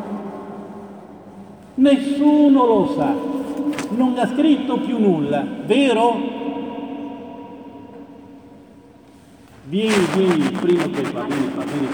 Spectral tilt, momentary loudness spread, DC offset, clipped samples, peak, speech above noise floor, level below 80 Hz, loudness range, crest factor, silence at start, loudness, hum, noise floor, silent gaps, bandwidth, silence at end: -6 dB/octave; 22 LU; under 0.1%; under 0.1%; -2 dBFS; 29 dB; -60 dBFS; 10 LU; 16 dB; 0 s; -19 LUFS; none; -46 dBFS; none; 16 kHz; 0 s